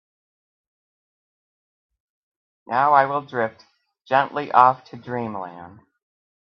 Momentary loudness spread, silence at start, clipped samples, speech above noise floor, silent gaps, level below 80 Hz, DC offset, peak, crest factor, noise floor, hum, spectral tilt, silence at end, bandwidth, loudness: 15 LU; 2.7 s; under 0.1%; over 69 dB; none; -74 dBFS; under 0.1%; 0 dBFS; 24 dB; under -90 dBFS; none; -7 dB/octave; 0.8 s; 6.2 kHz; -20 LUFS